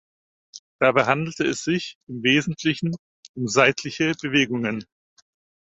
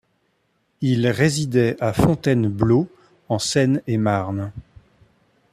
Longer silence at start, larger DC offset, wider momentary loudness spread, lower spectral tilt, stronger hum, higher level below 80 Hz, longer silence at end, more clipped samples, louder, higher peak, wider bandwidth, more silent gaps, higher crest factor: second, 0.55 s vs 0.8 s; neither; first, 12 LU vs 9 LU; second, -4.5 dB/octave vs -6 dB/octave; neither; second, -62 dBFS vs -46 dBFS; about the same, 0.85 s vs 0.9 s; neither; about the same, -22 LUFS vs -20 LUFS; about the same, -2 dBFS vs -4 dBFS; second, 8.2 kHz vs 14.5 kHz; first, 0.59-0.79 s, 1.95-2.07 s, 2.99-3.23 s, 3.29-3.34 s vs none; about the same, 22 dB vs 18 dB